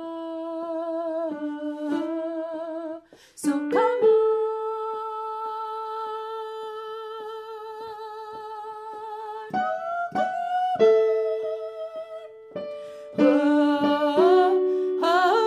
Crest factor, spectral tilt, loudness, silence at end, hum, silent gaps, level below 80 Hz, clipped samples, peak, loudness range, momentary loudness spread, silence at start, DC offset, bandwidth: 18 dB; -5 dB/octave; -25 LUFS; 0 s; none; none; -74 dBFS; under 0.1%; -8 dBFS; 11 LU; 17 LU; 0 s; under 0.1%; 13.5 kHz